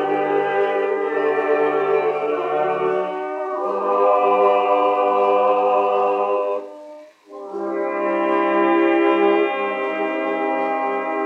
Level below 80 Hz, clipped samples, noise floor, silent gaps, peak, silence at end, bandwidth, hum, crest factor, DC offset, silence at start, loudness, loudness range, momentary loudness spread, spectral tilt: -90 dBFS; under 0.1%; -41 dBFS; none; -4 dBFS; 0 s; 6.8 kHz; none; 14 dB; under 0.1%; 0 s; -19 LUFS; 3 LU; 8 LU; -6.5 dB/octave